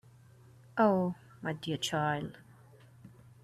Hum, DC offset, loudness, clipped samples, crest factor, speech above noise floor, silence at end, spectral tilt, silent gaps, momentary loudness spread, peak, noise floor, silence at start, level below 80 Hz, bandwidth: none; under 0.1%; -33 LUFS; under 0.1%; 20 dB; 27 dB; 0.35 s; -5.5 dB/octave; none; 13 LU; -16 dBFS; -58 dBFS; 0.75 s; -70 dBFS; 14 kHz